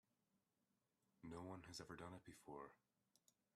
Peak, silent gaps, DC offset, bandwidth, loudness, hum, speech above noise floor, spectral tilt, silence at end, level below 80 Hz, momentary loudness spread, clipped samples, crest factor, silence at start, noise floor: -40 dBFS; none; under 0.1%; 13 kHz; -58 LUFS; none; 31 dB; -4.5 dB/octave; 0.8 s; -82 dBFS; 7 LU; under 0.1%; 20 dB; 1.2 s; -89 dBFS